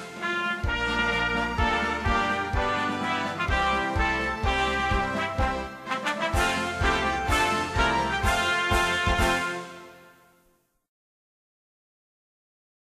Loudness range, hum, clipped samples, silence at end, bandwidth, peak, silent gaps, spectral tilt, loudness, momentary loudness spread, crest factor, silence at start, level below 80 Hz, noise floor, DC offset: 4 LU; none; under 0.1%; 2.85 s; 15.5 kHz; -10 dBFS; none; -4 dB/octave; -25 LUFS; 5 LU; 18 dB; 0 s; -36 dBFS; -66 dBFS; under 0.1%